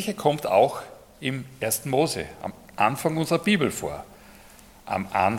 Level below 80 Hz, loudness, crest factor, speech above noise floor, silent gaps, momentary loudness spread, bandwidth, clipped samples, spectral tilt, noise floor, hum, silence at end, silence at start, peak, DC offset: -56 dBFS; -25 LUFS; 22 dB; 25 dB; none; 16 LU; 17.5 kHz; under 0.1%; -4.5 dB/octave; -50 dBFS; none; 0 s; 0 s; -4 dBFS; under 0.1%